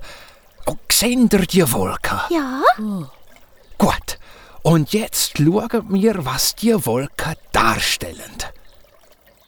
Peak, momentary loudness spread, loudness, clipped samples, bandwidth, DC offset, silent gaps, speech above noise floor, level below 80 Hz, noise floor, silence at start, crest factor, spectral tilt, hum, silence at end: -2 dBFS; 15 LU; -18 LUFS; under 0.1%; over 20 kHz; under 0.1%; none; 33 dB; -38 dBFS; -51 dBFS; 0 s; 18 dB; -4 dB/octave; none; 0.8 s